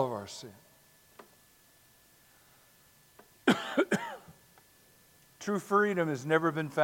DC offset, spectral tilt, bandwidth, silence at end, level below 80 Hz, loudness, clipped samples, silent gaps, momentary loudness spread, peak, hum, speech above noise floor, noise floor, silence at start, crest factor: under 0.1%; -5.5 dB/octave; 17 kHz; 0 s; -78 dBFS; -31 LUFS; under 0.1%; none; 17 LU; -8 dBFS; none; 33 dB; -63 dBFS; 0 s; 26 dB